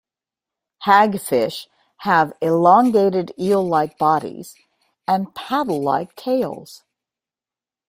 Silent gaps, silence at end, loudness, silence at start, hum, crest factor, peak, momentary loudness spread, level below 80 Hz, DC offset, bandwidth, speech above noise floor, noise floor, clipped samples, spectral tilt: none; 1.15 s; -18 LUFS; 0.8 s; none; 20 dB; 0 dBFS; 14 LU; -64 dBFS; under 0.1%; 16 kHz; over 72 dB; under -90 dBFS; under 0.1%; -6 dB/octave